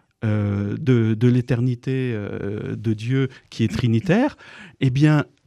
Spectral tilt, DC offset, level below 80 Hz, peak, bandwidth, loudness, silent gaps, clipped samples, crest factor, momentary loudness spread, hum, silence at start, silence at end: -8 dB/octave; under 0.1%; -50 dBFS; -6 dBFS; 10.5 kHz; -21 LUFS; none; under 0.1%; 16 dB; 10 LU; none; 0.2 s; 0.25 s